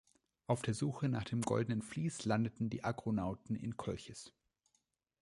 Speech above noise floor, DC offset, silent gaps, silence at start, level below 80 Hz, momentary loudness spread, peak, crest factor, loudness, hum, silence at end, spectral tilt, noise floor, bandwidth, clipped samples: 44 dB; under 0.1%; none; 0.5 s; -64 dBFS; 10 LU; -18 dBFS; 20 dB; -39 LUFS; none; 0.9 s; -6.5 dB/octave; -82 dBFS; 11.5 kHz; under 0.1%